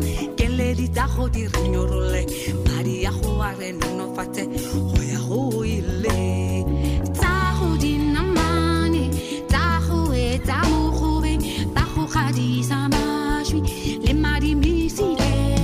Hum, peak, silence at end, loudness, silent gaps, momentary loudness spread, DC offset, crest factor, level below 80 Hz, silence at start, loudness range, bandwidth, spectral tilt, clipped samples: none; -8 dBFS; 0 s; -22 LUFS; none; 5 LU; under 0.1%; 12 dB; -26 dBFS; 0 s; 3 LU; 16 kHz; -6 dB/octave; under 0.1%